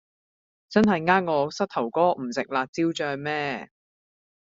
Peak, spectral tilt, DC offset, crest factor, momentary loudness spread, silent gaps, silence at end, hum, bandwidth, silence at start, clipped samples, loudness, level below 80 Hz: -4 dBFS; -4 dB/octave; under 0.1%; 22 dB; 7 LU; 2.69-2.73 s; 0.85 s; none; 7.8 kHz; 0.7 s; under 0.1%; -25 LUFS; -64 dBFS